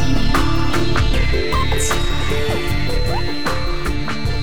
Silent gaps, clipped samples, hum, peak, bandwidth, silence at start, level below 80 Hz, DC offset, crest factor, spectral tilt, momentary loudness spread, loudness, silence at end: none; under 0.1%; none; -6 dBFS; 18 kHz; 0 s; -22 dBFS; 10%; 12 dB; -4.5 dB/octave; 5 LU; -20 LUFS; 0 s